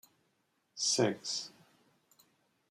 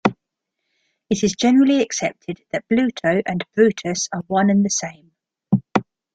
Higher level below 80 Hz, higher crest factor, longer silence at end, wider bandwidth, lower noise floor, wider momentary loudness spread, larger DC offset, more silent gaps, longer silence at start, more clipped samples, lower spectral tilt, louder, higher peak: second, -84 dBFS vs -58 dBFS; about the same, 22 dB vs 18 dB; first, 1.2 s vs 0.3 s; first, 15 kHz vs 9.2 kHz; about the same, -78 dBFS vs -80 dBFS; first, 19 LU vs 10 LU; neither; neither; first, 0.75 s vs 0.05 s; neither; second, -2.5 dB/octave vs -5 dB/octave; second, -33 LUFS vs -19 LUFS; second, -16 dBFS vs -2 dBFS